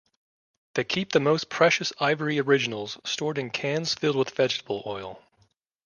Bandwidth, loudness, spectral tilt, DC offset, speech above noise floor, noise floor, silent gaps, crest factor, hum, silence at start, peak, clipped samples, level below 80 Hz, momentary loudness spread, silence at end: 10 kHz; -25 LUFS; -4 dB/octave; under 0.1%; 42 dB; -67 dBFS; none; 22 dB; none; 0.75 s; -6 dBFS; under 0.1%; -68 dBFS; 11 LU; 0.7 s